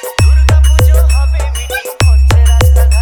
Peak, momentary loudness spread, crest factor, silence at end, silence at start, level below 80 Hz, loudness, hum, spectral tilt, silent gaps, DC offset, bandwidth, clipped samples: 0 dBFS; 8 LU; 8 dB; 0 s; 0 s; -8 dBFS; -10 LUFS; none; -5 dB/octave; none; under 0.1%; 19.5 kHz; under 0.1%